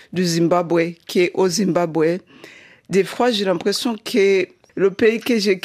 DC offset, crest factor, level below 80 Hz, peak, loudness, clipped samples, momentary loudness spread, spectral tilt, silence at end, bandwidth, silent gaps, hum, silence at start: under 0.1%; 14 dB; -64 dBFS; -4 dBFS; -19 LUFS; under 0.1%; 5 LU; -5 dB/octave; 0.05 s; 15.5 kHz; none; none; 0.15 s